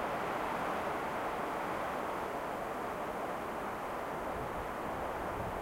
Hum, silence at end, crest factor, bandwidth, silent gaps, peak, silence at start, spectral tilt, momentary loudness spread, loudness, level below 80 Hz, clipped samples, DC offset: none; 0 s; 14 dB; 16 kHz; none; -24 dBFS; 0 s; -5 dB/octave; 3 LU; -38 LUFS; -56 dBFS; under 0.1%; under 0.1%